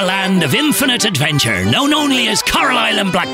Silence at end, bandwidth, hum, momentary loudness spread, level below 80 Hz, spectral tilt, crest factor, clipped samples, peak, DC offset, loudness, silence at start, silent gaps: 0 s; 16.5 kHz; none; 2 LU; -42 dBFS; -3.5 dB/octave; 10 dB; under 0.1%; -4 dBFS; under 0.1%; -13 LUFS; 0 s; none